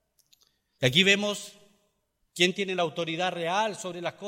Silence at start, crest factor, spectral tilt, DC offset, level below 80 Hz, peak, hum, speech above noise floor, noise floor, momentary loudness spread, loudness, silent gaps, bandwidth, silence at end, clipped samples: 0.8 s; 22 dB; -3.5 dB/octave; under 0.1%; -68 dBFS; -6 dBFS; none; 47 dB; -74 dBFS; 14 LU; -26 LUFS; none; 16.5 kHz; 0 s; under 0.1%